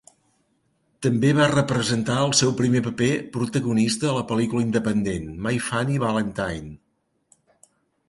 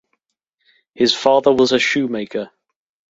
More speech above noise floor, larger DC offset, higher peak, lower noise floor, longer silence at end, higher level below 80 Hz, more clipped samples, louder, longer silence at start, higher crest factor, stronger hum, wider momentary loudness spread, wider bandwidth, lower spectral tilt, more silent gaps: second, 49 dB vs 58 dB; neither; second, -4 dBFS vs 0 dBFS; about the same, -71 dBFS vs -74 dBFS; first, 1.35 s vs 0.65 s; first, -50 dBFS vs -60 dBFS; neither; second, -22 LUFS vs -16 LUFS; about the same, 1 s vs 1 s; about the same, 18 dB vs 18 dB; neither; second, 8 LU vs 13 LU; first, 11.5 kHz vs 8 kHz; first, -5 dB/octave vs -3.5 dB/octave; neither